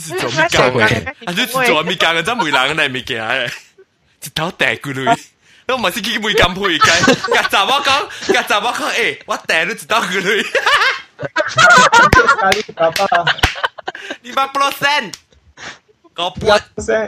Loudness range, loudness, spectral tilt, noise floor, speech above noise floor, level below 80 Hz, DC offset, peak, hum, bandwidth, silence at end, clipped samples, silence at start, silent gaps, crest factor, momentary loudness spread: 7 LU; -14 LUFS; -3 dB/octave; -50 dBFS; 36 dB; -38 dBFS; under 0.1%; 0 dBFS; none; 16.5 kHz; 0 s; under 0.1%; 0 s; none; 16 dB; 12 LU